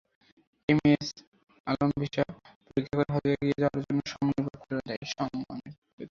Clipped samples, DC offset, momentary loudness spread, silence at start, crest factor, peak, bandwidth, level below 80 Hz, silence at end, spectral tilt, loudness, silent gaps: under 0.1%; under 0.1%; 13 LU; 0.7 s; 20 dB; -10 dBFS; 7.2 kHz; -58 dBFS; 0.05 s; -6.5 dB/octave; -30 LUFS; 1.27-1.32 s, 1.60-1.64 s, 2.56-2.61 s, 4.97-5.02 s, 5.78-5.82 s, 5.93-5.98 s